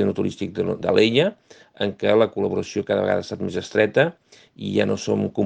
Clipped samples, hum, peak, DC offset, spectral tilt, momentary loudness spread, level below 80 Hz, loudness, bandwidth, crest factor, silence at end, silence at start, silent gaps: under 0.1%; none; -2 dBFS; under 0.1%; -6 dB/octave; 9 LU; -60 dBFS; -22 LUFS; 9 kHz; 18 dB; 0 s; 0 s; none